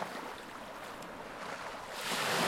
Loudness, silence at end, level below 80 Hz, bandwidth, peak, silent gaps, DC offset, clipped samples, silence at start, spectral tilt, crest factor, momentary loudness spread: -40 LUFS; 0 s; -66 dBFS; 16.5 kHz; -18 dBFS; none; under 0.1%; under 0.1%; 0 s; -2.5 dB/octave; 20 dB; 11 LU